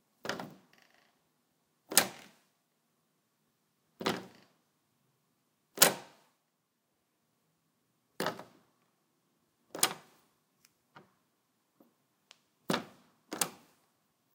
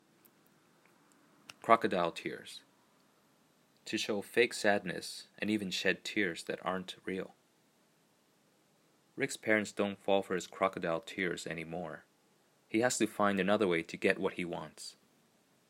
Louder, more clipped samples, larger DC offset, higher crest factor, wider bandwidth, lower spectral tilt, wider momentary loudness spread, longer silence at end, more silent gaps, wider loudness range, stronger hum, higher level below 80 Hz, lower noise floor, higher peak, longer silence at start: about the same, -32 LUFS vs -34 LUFS; neither; neither; first, 40 dB vs 28 dB; about the same, 17.5 kHz vs 16 kHz; second, -1 dB/octave vs -4 dB/octave; first, 25 LU vs 17 LU; about the same, 0.8 s vs 0.75 s; neither; first, 11 LU vs 5 LU; neither; second, -88 dBFS vs -78 dBFS; first, -80 dBFS vs -71 dBFS; first, 0 dBFS vs -8 dBFS; second, 0.25 s vs 1.65 s